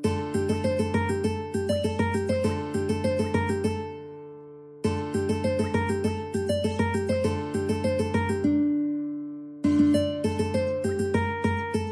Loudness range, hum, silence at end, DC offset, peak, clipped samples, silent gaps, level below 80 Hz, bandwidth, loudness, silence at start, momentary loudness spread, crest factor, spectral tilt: 3 LU; none; 0 s; under 0.1%; -10 dBFS; under 0.1%; none; -50 dBFS; 11 kHz; -27 LUFS; 0 s; 7 LU; 16 dB; -6.5 dB/octave